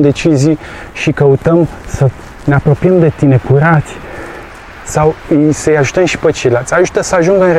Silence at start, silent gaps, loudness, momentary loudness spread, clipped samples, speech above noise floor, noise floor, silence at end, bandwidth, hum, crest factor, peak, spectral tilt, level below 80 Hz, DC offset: 0 s; none; -11 LUFS; 17 LU; under 0.1%; 20 dB; -30 dBFS; 0 s; 12.5 kHz; none; 10 dB; 0 dBFS; -6.5 dB/octave; -34 dBFS; under 0.1%